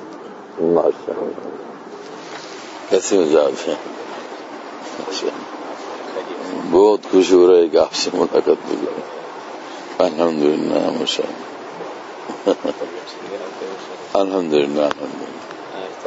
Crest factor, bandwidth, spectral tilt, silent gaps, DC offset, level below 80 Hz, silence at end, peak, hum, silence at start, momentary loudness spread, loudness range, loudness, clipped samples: 18 dB; 8 kHz; -4 dB/octave; none; under 0.1%; -62 dBFS; 0 s; 0 dBFS; none; 0 s; 19 LU; 8 LU; -18 LUFS; under 0.1%